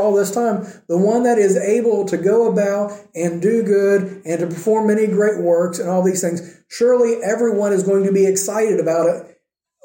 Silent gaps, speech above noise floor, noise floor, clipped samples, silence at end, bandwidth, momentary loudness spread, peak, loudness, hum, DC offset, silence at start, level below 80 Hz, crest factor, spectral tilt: none; 45 dB; -62 dBFS; under 0.1%; 0.6 s; 17 kHz; 8 LU; -4 dBFS; -17 LUFS; none; under 0.1%; 0 s; -70 dBFS; 12 dB; -6 dB/octave